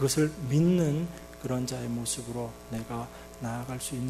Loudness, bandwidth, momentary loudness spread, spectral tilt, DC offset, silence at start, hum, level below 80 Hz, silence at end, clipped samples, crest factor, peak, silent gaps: -31 LUFS; 14 kHz; 14 LU; -5.5 dB/octave; under 0.1%; 0 s; none; -52 dBFS; 0 s; under 0.1%; 16 dB; -14 dBFS; none